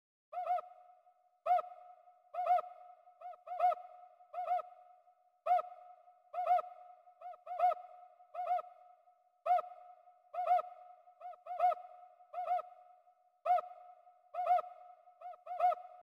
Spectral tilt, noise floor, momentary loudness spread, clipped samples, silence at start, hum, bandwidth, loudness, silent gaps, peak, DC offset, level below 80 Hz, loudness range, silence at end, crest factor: -1.5 dB/octave; -70 dBFS; 22 LU; under 0.1%; 0.35 s; none; 5.4 kHz; -37 LUFS; none; -22 dBFS; under 0.1%; under -90 dBFS; 1 LU; 0.1 s; 16 dB